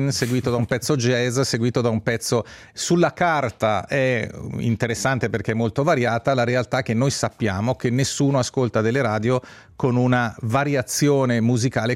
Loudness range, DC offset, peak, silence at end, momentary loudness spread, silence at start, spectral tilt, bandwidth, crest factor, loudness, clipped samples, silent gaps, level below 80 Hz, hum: 1 LU; under 0.1%; -6 dBFS; 0 s; 4 LU; 0 s; -5.5 dB/octave; 16 kHz; 14 dB; -21 LUFS; under 0.1%; none; -54 dBFS; none